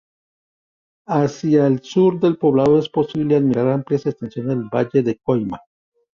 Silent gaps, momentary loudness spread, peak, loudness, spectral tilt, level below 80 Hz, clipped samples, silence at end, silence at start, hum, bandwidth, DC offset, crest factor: none; 8 LU; -4 dBFS; -18 LUFS; -8 dB/octave; -56 dBFS; under 0.1%; 0.6 s; 1.1 s; none; 7.4 kHz; under 0.1%; 14 dB